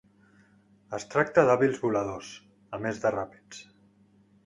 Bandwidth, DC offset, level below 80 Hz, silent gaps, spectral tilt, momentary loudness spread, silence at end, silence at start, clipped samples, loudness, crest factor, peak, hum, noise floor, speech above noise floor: 11 kHz; under 0.1%; -64 dBFS; none; -6 dB/octave; 24 LU; 0.85 s; 0.9 s; under 0.1%; -27 LUFS; 24 dB; -6 dBFS; none; -61 dBFS; 34 dB